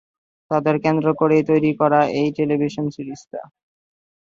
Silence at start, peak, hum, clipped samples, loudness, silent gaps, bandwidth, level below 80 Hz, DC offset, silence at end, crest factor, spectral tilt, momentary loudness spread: 0.5 s; -2 dBFS; none; under 0.1%; -19 LUFS; none; 7.4 kHz; -60 dBFS; under 0.1%; 0.9 s; 18 dB; -8 dB/octave; 16 LU